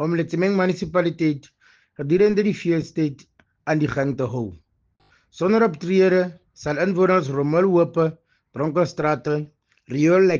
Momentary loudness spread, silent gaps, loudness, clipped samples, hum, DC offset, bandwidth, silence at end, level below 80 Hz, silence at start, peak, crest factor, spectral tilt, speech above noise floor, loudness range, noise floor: 12 LU; none; -21 LUFS; under 0.1%; none; under 0.1%; 7.4 kHz; 0 s; -56 dBFS; 0 s; -6 dBFS; 16 dB; -7.5 dB/octave; 44 dB; 4 LU; -64 dBFS